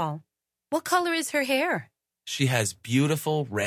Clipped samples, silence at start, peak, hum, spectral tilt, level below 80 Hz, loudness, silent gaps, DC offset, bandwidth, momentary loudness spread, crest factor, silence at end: under 0.1%; 0 s; -10 dBFS; none; -4.5 dB/octave; -64 dBFS; -26 LUFS; none; under 0.1%; 16 kHz; 8 LU; 18 dB; 0 s